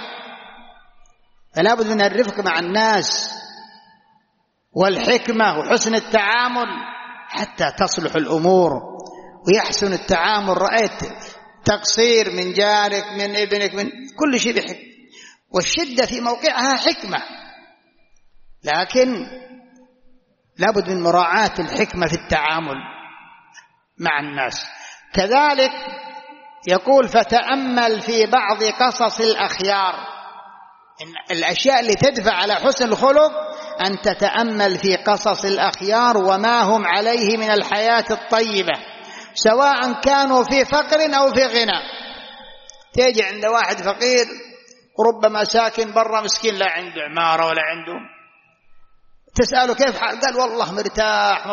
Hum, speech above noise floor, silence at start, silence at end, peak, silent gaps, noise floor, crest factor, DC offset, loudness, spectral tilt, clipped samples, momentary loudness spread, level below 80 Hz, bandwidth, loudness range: none; 49 dB; 0 s; 0 s; -2 dBFS; none; -67 dBFS; 16 dB; under 0.1%; -18 LUFS; -1.5 dB/octave; under 0.1%; 16 LU; -48 dBFS; 7.2 kHz; 4 LU